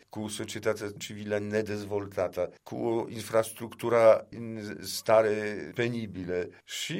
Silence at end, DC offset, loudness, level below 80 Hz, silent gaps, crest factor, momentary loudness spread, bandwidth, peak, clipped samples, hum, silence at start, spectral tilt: 0 s; under 0.1%; -30 LUFS; -68 dBFS; none; 20 dB; 14 LU; 16 kHz; -8 dBFS; under 0.1%; none; 0.15 s; -4.5 dB/octave